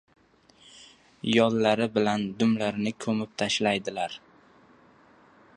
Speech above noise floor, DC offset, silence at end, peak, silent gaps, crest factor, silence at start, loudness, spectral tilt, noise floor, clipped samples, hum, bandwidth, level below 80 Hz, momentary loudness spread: 34 dB; under 0.1%; 1.4 s; -6 dBFS; none; 22 dB; 0.8 s; -26 LUFS; -5 dB/octave; -59 dBFS; under 0.1%; none; 10.5 kHz; -66 dBFS; 11 LU